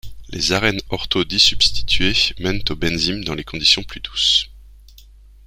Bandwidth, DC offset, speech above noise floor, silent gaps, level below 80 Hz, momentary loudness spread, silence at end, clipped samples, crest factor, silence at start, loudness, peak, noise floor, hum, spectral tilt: 16 kHz; under 0.1%; 26 dB; none; -34 dBFS; 12 LU; 0.85 s; under 0.1%; 20 dB; 0.05 s; -17 LUFS; 0 dBFS; -44 dBFS; 50 Hz at -35 dBFS; -2.5 dB/octave